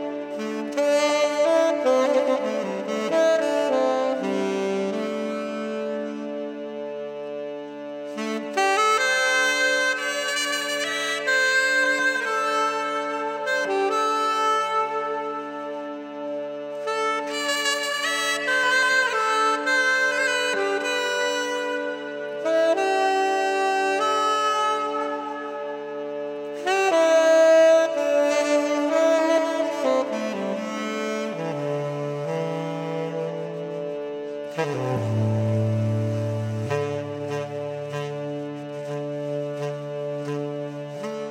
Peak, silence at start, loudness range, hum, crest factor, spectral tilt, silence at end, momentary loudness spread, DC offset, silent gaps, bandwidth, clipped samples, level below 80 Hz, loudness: -8 dBFS; 0 s; 9 LU; none; 14 dB; -4 dB/octave; 0 s; 12 LU; under 0.1%; none; 16.5 kHz; under 0.1%; -78 dBFS; -23 LUFS